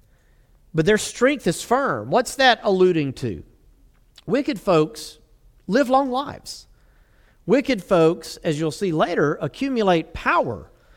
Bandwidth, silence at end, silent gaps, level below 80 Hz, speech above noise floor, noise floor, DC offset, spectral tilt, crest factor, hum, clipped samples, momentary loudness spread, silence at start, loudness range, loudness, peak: 17 kHz; 0.3 s; none; -50 dBFS; 35 dB; -56 dBFS; under 0.1%; -5 dB/octave; 20 dB; none; under 0.1%; 18 LU; 0.75 s; 4 LU; -21 LUFS; -2 dBFS